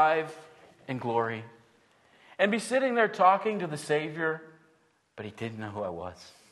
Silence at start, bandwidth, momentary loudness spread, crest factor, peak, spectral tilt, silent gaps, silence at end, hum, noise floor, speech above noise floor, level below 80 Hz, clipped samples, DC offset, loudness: 0 s; 12.5 kHz; 20 LU; 22 dB; -8 dBFS; -5 dB/octave; none; 0.2 s; none; -67 dBFS; 39 dB; -72 dBFS; under 0.1%; under 0.1%; -29 LUFS